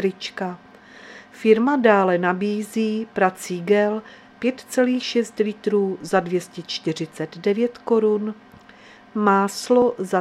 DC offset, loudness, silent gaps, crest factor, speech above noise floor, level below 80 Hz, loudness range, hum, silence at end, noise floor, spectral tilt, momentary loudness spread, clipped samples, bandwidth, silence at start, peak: under 0.1%; -21 LUFS; none; 20 dB; 26 dB; -68 dBFS; 3 LU; none; 0 s; -47 dBFS; -5.5 dB/octave; 13 LU; under 0.1%; 15 kHz; 0 s; 0 dBFS